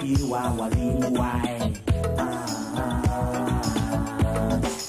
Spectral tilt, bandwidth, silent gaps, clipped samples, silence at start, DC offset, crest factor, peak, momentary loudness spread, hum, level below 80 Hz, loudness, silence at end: -6 dB/octave; 15.5 kHz; none; under 0.1%; 0 s; under 0.1%; 14 dB; -10 dBFS; 4 LU; none; -34 dBFS; -26 LUFS; 0 s